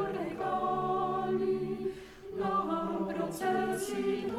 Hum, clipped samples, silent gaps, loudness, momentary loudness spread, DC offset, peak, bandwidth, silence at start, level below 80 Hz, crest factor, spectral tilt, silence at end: none; under 0.1%; none; -33 LUFS; 5 LU; under 0.1%; -20 dBFS; 14.5 kHz; 0 s; -60 dBFS; 12 dB; -5.5 dB/octave; 0 s